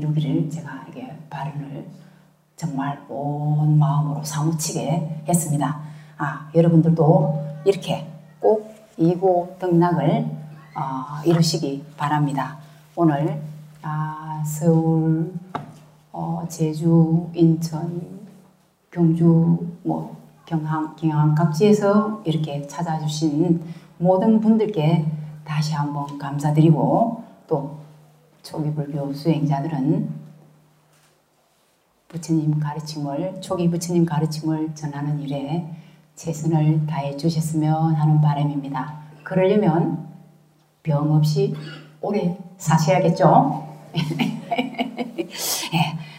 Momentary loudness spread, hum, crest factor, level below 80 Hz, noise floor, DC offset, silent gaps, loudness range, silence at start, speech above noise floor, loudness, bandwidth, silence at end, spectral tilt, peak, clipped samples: 16 LU; none; 20 dB; -62 dBFS; -63 dBFS; under 0.1%; none; 5 LU; 0 s; 42 dB; -21 LUFS; 16 kHz; 0 s; -7 dB/octave; 0 dBFS; under 0.1%